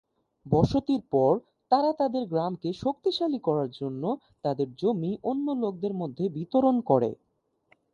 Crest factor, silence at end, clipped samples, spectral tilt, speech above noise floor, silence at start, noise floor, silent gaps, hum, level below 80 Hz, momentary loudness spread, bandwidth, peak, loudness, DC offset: 20 dB; 0.8 s; under 0.1%; -8.5 dB/octave; 40 dB; 0.45 s; -67 dBFS; none; none; -54 dBFS; 8 LU; 7.2 kHz; -8 dBFS; -27 LUFS; under 0.1%